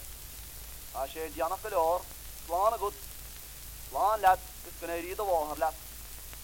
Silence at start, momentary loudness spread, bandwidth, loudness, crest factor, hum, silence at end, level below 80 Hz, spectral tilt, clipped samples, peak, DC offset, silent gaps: 0 s; 17 LU; 17 kHz; -31 LUFS; 22 dB; none; 0 s; -50 dBFS; -3 dB/octave; under 0.1%; -10 dBFS; under 0.1%; none